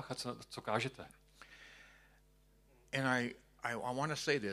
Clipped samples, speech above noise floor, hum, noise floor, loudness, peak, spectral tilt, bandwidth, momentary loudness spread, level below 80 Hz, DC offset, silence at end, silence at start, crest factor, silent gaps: under 0.1%; 30 dB; 50 Hz at -70 dBFS; -68 dBFS; -39 LUFS; -18 dBFS; -4.5 dB/octave; 15 kHz; 22 LU; -70 dBFS; under 0.1%; 0 s; 0 s; 22 dB; none